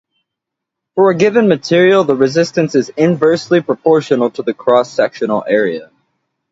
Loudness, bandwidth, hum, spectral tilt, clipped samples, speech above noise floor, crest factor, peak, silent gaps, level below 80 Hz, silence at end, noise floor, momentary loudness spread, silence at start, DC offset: -13 LUFS; 7.8 kHz; none; -6 dB/octave; under 0.1%; 67 dB; 14 dB; 0 dBFS; none; -60 dBFS; 0.65 s; -80 dBFS; 7 LU; 0.95 s; under 0.1%